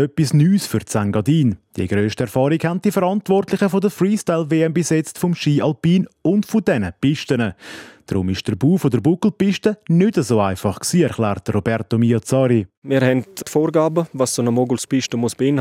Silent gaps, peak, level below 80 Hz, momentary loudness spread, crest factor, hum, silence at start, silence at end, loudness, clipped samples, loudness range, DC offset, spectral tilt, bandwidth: 12.77-12.82 s; -2 dBFS; -56 dBFS; 5 LU; 16 dB; none; 0 s; 0 s; -18 LUFS; under 0.1%; 2 LU; under 0.1%; -6.5 dB/octave; 16.5 kHz